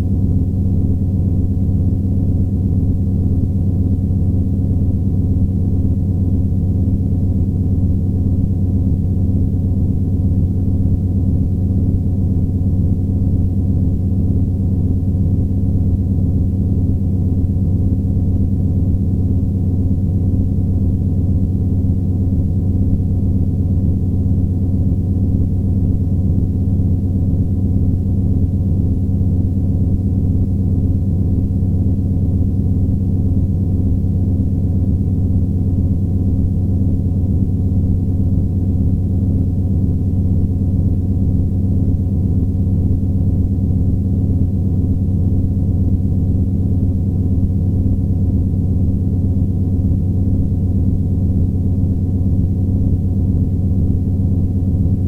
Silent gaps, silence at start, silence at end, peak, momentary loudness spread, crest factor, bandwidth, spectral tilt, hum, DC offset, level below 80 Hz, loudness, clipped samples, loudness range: none; 0 s; 0 s; -4 dBFS; 1 LU; 12 dB; 1.1 kHz; -12.5 dB/octave; none; under 0.1%; -24 dBFS; -17 LUFS; under 0.1%; 0 LU